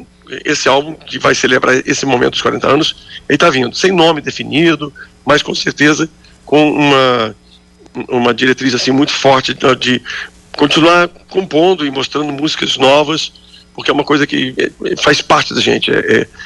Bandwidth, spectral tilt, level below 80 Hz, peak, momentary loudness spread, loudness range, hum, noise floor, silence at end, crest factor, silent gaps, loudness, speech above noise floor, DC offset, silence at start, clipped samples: 11.5 kHz; -4 dB/octave; -46 dBFS; -2 dBFS; 10 LU; 2 LU; none; -43 dBFS; 0 s; 12 dB; none; -12 LUFS; 31 dB; under 0.1%; 0 s; under 0.1%